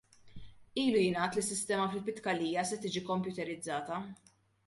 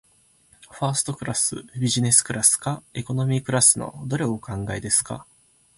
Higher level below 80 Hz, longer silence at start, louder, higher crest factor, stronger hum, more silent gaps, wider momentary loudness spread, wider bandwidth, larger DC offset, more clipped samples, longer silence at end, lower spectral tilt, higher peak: second, -68 dBFS vs -52 dBFS; second, 0.25 s vs 0.7 s; second, -34 LUFS vs -21 LUFS; second, 16 dB vs 22 dB; neither; neither; second, 10 LU vs 13 LU; about the same, 12 kHz vs 11.5 kHz; neither; neither; about the same, 0.55 s vs 0.55 s; about the same, -4 dB/octave vs -3.5 dB/octave; second, -18 dBFS vs -2 dBFS